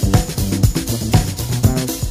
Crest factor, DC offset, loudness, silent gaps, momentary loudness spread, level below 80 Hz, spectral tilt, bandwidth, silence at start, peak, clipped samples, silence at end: 16 dB; under 0.1%; -18 LUFS; none; 4 LU; -24 dBFS; -5.5 dB/octave; 16 kHz; 0 s; 0 dBFS; under 0.1%; 0 s